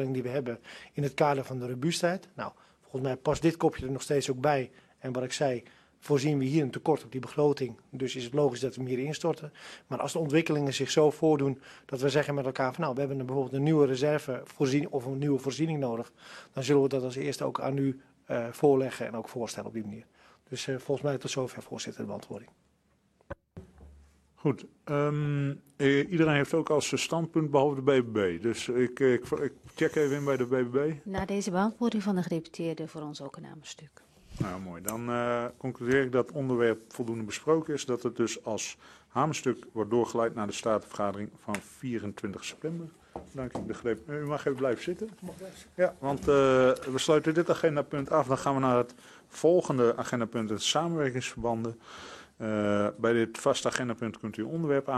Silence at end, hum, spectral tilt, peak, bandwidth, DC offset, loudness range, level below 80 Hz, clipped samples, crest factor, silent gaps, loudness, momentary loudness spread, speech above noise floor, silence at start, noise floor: 0 s; none; -5.5 dB/octave; -8 dBFS; 13.5 kHz; under 0.1%; 8 LU; -62 dBFS; under 0.1%; 22 dB; none; -30 LUFS; 14 LU; 40 dB; 0 s; -69 dBFS